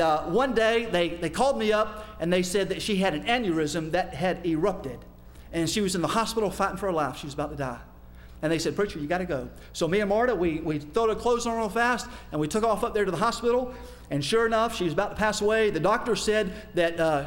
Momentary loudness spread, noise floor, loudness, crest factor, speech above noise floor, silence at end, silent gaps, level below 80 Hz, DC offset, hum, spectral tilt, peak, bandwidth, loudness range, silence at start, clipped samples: 9 LU; -46 dBFS; -26 LUFS; 16 dB; 20 dB; 0 s; none; -46 dBFS; under 0.1%; 60 Hz at -50 dBFS; -4.5 dB/octave; -10 dBFS; 16.5 kHz; 3 LU; 0 s; under 0.1%